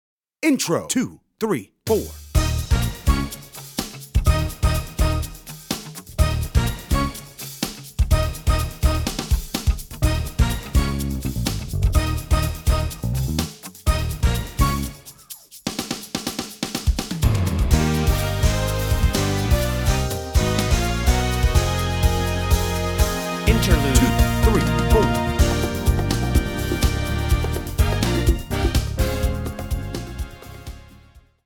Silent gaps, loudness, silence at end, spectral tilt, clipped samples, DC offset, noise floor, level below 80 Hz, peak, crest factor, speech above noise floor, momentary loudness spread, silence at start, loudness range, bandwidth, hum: none; -22 LUFS; 0.25 s; -5 dB/octave; under 0.1%; under 0.1%; -50 dBFS; -24 dBFS; -2 dBFS; 20 dB; 28 dB; 10 LU; 0.4 s; 6 LU; 20 kHz; none